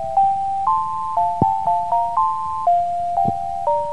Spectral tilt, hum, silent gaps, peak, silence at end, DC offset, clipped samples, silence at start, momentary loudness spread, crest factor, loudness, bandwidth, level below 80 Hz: -7.5 dB/octave; none; none; -2 dBFS; 0 s; 2%; under 0.1%; 0 s; 3 LU; 18 dB; -20 LUFS; 11 kHz; -50 dBFS